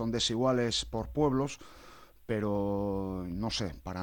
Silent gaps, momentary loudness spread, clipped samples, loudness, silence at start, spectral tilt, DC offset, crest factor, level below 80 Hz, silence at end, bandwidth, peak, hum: none; 9 LU; under 0.1%; -32 LUFS; 0 s; -5 dB/octave; under 0.1%; 16 dB; -50 dBFS; 0 s; 17.5 kHz; -16 dBFS; none